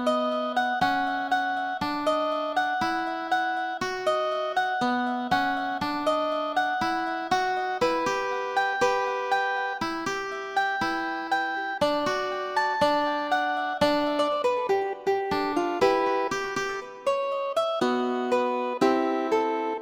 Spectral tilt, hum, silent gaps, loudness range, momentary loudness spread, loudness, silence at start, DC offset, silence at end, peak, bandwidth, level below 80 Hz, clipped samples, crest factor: -4 dB/octave; none; none; 2 LU; 5 LU; -26 LUFS; 0 s; under 0.1%; 0 s; -10 dBFS; 19.5 kHz; -60 dBFS; under 0.1%; 18 dB